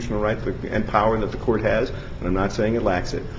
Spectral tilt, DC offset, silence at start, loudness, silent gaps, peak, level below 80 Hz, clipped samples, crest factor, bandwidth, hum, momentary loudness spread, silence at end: -7 dB/octave; under 0.1%; 0 s; -23 LUFS; none; -2 dBFS; -34 dBFS; under 0.1%; 20 dB; 7.8 kHz; none; 6 LU; 0 s